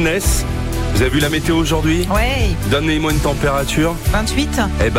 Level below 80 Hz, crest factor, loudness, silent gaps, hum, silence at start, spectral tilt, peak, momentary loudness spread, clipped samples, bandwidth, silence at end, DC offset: -22 dBFS; 10 dB; -17 LUFS; none; none; 0 s; -5 dB/octave; -4 dBFS; 3 LU; under 0.1%; 16 kHz; 0 s; under 0.1%